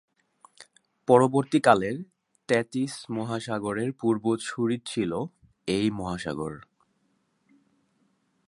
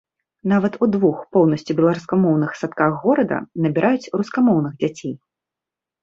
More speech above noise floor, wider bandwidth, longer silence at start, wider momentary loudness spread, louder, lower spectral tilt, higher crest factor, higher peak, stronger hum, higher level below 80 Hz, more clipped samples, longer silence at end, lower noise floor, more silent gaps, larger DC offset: second, 46 dB vs 69 dB; first, 11.5 kHz vs 7.6 kHz; first, 0.6 s vs 0.45 s; first, 16 LU vs 7 LU; second, -26 LUFS vs -19 LUFS; second, -6 dB/octave vs -8 dB/octave; first, 24 dB vs 18 dB; about the same, -4 dBFS vs -2 dBFS; neither; about the same, -60 dBFS vs -62 dBFS; neither; first, 1.85 s vs 0.85 s; second, -71 dBFS vs -87 dBFS; neither; neither